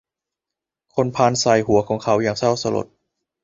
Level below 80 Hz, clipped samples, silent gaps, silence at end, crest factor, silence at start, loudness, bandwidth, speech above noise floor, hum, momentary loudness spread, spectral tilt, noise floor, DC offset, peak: -52 dBFS; under 0.1%; none; 0.6 s; 18 dB; 0.95 s; -19 LUFS; 7.8 kHz; 68 dB; none; 10 LU; -5 dB/octave; -86 dBFS; under 0.1%; -2 dBFS